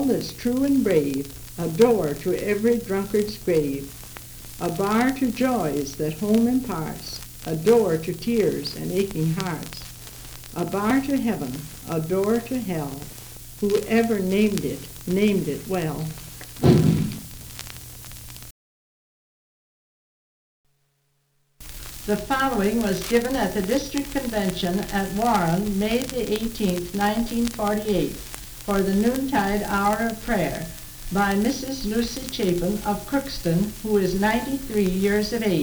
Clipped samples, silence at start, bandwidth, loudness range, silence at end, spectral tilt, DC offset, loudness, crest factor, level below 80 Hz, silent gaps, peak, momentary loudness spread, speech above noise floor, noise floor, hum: under 0.1%; 0 s; over 20 kHz; 3 LU; 0 s; -5.5 dB/octave; under 0.1%; -23 LUFS; 20 dB; -42 dBFS; 18.51-20.64 s; -4 dBFS; 15 LU; 46 dB; -69 dBFS; none